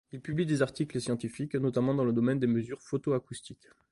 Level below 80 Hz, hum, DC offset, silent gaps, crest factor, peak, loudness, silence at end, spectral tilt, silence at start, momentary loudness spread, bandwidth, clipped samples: -64 dBFS; none; under 0.1%; none; 16 dB; -14 dBFS; -31 LUFS; 0.35 s; -7 dB/octave; 0.15 s; 8 LU; 11.5 kHz; under 0.1%